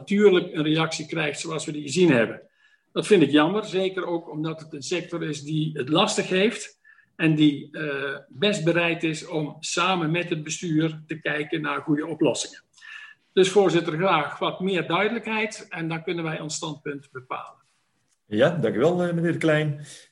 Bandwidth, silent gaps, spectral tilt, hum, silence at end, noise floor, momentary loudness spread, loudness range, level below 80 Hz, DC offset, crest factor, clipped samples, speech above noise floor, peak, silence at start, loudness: 11.5 kHz; none; -5 dB/octave; none; 0.1 s; -71 dBFS; 13 LU; 4 LU; -70 dBFS; under 0.1%; 20 dB; under 0.1%; 47 dB; -4 dBFS; 0 s; -24 LUFS